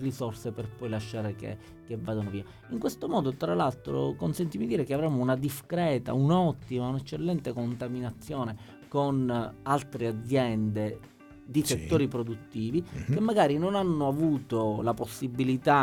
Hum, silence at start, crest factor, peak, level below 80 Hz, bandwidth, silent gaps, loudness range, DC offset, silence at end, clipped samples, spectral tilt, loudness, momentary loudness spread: none; 0 s; 20 dB; -10 dBFS; -56 dBFS; 17.5 kHz; none; 4 LU; under 0.1%; 0 s; under 0.1%; -6.5 dB/octave; -30 LUFS; 10 LU